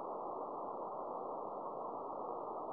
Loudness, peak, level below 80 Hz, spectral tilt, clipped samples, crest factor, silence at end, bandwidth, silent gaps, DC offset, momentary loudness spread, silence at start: -44 LUFS; -30 dBFS; -82 dBFS; -9 dB/octave; under 0.1%; 14 dB; 0 s; 5 kHz; none; under 0.1%; 1 LU; 0 s